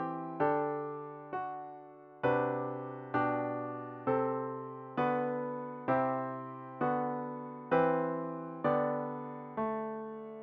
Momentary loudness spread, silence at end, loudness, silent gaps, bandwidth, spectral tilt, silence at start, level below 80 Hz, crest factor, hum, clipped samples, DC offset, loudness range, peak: 11 LU; 0 s; -35 LUFS; none; 5.2 kHz; -6.5 dB/octave; 0 s; -74 dBFS; 18 dB; none; under 0.1%; under 0.1%; 2 LU; -16 dBFS